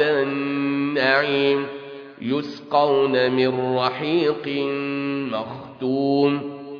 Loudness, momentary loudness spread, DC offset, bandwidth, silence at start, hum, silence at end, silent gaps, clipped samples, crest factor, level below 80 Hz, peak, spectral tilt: -22 LUFS; 10 LU; under 0.1%; 5.4 kHz; 0 s; none; 0 s; none; under 0.1%; 18 dB; -66 dBFS; -4 dBFS; -7.5 dB/octave